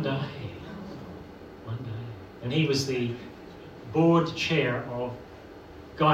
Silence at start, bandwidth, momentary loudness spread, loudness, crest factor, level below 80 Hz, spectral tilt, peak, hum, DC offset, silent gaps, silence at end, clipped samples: 0 s; 14.5 kHz; 21 LU; -28 LUFS; 20 dB; -58 dBFS; -6 dB/octave; -8 dBFS; none; under 0.1%; none; 0 s; under 0.1%